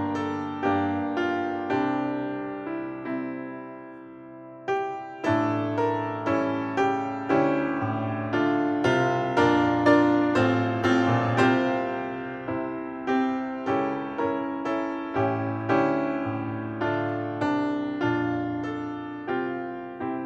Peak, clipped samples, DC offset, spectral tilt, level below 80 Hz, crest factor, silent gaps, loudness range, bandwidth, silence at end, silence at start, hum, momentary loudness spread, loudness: -8 dBFS; under 0.1%; under 0.1%; -7 dB/octave; -62 dBFS; 18 dB; none; 8 LU; 8.2 kHz; 0 s; 0 s; none; 11 LU; -26 LUFS